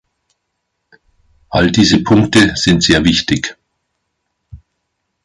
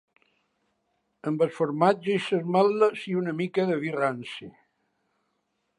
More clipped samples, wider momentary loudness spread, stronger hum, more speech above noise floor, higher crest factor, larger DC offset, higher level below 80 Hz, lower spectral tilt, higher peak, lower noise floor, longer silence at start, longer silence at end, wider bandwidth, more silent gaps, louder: neither; second, 8 LU vs 12 LU; neither; first, 60 dB vs 51 dB; second, 16 dB vs 22 dB; neither; first, -36 dBFS vs -76 dBFS; second, -4.5 dB/octave vs -7 dB/octave; first, 0 dBFS vs -6 dBFS; second, -72 dBFS vs -76 dBFS; first, 1.5 s vs 1.25 s; second, 0.7 s vs 1.3 s; about the same, 11.5 kHz vs 11 kHz; neither; first, -12 LUFS vs -26 LUFS